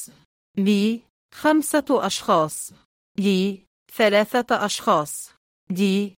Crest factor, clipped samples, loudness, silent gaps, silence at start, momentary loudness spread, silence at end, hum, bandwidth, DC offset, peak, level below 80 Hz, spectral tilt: 18 dB; under 0.1%; -22 LUFS; 0.25-0.54 s, 1.10-1.29 s, 2.85-3.15 s, 3.67-3.86 s, 5.37-5.67 s; 0 s; 15 LU; 0.1 s; none; 17 kHz; under 0.1%; -6 dBFS; -66 dBFS; -4.5 dB/octave